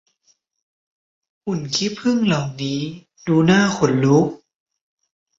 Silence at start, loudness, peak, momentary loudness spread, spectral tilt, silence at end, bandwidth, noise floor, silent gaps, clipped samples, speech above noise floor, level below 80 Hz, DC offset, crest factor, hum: 1.45 s; -19 LUFS; -4 dBFS; 12 LU; -5.5 dB/octave; 1.05 s; 7.8 kHz; -64 dBFS; none; under 0.1%; 46 dB; -56 dBFS; under 0.1%; 18 dB; none